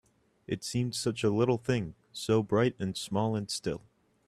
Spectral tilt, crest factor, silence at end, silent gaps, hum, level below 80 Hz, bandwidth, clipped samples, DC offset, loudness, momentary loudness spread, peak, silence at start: -5.5 dB/octave; 18 dB; 0.45 s; none; none; -62 dBFS; 14 kHz; under 0.1%; under 0.1%; -31 LUFS; 11 LU; -14 dBFS; 0.5 s